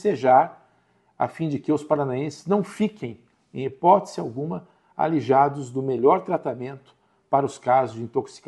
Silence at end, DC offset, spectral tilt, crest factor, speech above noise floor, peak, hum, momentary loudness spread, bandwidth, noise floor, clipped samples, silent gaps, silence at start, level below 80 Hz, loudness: 0.1 s; under 0.1%; -7.5 dB/octave; 20 dB; 41 dB; -4 dBFS; none; 14 LU; 11.5 kHz; -63 dBFS; under 0.1%; none; 0 s; -68 dBFS; -23 LUFS